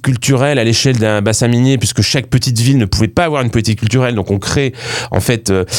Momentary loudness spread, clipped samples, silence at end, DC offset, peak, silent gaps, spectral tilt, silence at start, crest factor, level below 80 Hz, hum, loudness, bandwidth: 4 LU; under 0.1%; 0 s; under 0.1%; 0 dBFS; none; -5 dB/octave; 0.05 s; 12 dB; -34 dBFS; none; -13 LUFS; 18.5 kHz